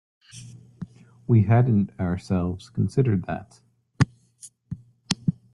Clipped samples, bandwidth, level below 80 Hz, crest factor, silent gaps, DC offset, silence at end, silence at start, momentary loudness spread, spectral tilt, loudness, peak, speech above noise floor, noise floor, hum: under 0.1%; 11.5 kHz; -54 dBFS; 24 dB; none; under 0.1%; 0.25 s; 0.35 s; 22 LU; -7 dB/octave; -24 LUFS; -2 dBFS; 29 dB; -50 dBFS; none